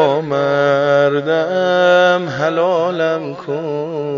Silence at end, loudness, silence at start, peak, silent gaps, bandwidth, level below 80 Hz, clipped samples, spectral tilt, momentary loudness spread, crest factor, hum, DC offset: 0 s; -15 LUFS; 0 s; 0 dBFS; none; 7.2 kHz; -64 dBFS; under 0.1%; -6 dB/octave; 10 LU; 14 dB; none; under 0.1%